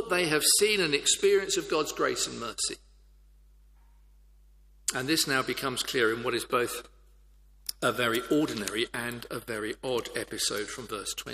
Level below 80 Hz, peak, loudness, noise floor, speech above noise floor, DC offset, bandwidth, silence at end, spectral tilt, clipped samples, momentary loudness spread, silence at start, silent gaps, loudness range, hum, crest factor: -58 dBFS; -8 dBFS; -28 LUFS; -57 dBFS; 28 dB; under 0.1%; 15.5 kHz; 0 s; -2 dB/octave; under 0.1%; 12 LU; 0 s; none; 6 LU; 50 Hz at -60 dBFS; 22 dB